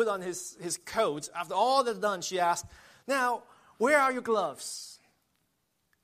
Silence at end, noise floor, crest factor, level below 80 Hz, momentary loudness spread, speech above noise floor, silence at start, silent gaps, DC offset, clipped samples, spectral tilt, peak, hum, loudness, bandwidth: 1.1 s; -77 dBFS; 20 dB; -70 dBFS; 13 LU; 47 dB; 0 s; none; under 0.1%; under 0.1%; -2.5 dB/octave; -12 dBFS; none; -29 LUFS; 15 kHz